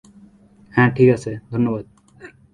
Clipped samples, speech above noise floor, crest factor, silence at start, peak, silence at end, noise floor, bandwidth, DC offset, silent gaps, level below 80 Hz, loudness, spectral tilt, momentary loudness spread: under 0.1%; 32 dB; 20 dB; 0.75 s; 0 dBFS; 0.25 s; -49 dBFS; 9.8 kHz; under 0.1%; none; -52 dBFS; -19 LUFS; -8 dB/octave; 12 LU